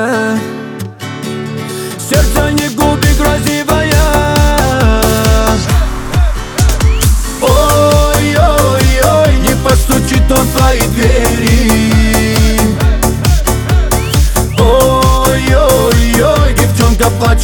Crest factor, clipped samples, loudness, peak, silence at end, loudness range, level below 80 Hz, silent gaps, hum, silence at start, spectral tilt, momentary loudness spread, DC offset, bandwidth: 10 dB; under 0.1%; -10 LUFS; 0 dBFS; 0 s; 2 LU; -14 dBFS; none; none; 0 s; -5 dB/octave; 6 LU; under 0.1%; over 20 kHz